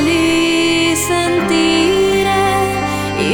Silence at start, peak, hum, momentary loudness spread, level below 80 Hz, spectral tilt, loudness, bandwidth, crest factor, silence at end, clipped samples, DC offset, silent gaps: 0 s; -2 dBFS; none; 5 LU; -38 dBFS; -4 dB/octave; -13 LUFS; over 20 kHz; 10 dB; 0 s; under 0.1%; under 0.1%; none